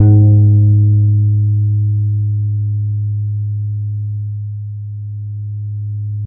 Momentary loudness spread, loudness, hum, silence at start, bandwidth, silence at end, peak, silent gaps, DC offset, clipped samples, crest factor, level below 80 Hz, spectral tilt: 15 LU; -15 LUFS; none; 0 s; 0.9 kHz; 0 s; 0 dBFS; none; under 0.1%; under 0.1%; 14 dB; -44 dBFS; -17 dB/octave